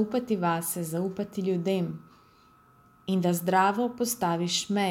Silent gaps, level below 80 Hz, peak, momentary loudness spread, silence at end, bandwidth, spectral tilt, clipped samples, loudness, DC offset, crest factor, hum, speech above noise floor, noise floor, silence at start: none; -68 dBFS; -10 dBFS; 8 LU; 0 s; 17 kHz; -4.5 dB/octave; under 0.1%; -28 LUFS; under 0.1%; 18 dB; none; 32 dB; -59 dBFS; 0 s